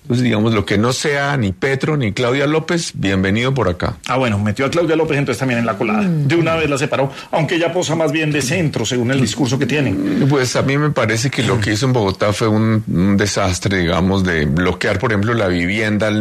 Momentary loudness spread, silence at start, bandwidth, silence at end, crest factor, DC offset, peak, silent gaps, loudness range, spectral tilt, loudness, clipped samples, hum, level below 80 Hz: 3 LU; 0.05 s; 13.5 kHz; 0 s; 12 dB; under 0.1%; -4 dBFS; none; 1 LU; -5.5 dB/octave; -16 LUFS; under 0.1%; none; -42 dBFS